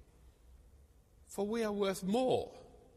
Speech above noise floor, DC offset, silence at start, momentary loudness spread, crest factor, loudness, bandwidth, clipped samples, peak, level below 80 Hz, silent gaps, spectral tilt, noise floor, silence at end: 29 dB; under 0.1%; 0.25 s; 16 LU; 18 dB; -35 LUFS; 15 kHz; under 0.1%; -20 dBFS; -62 dBFS; none; -5.5 dB/octave; -63 dBFS; 0.2 s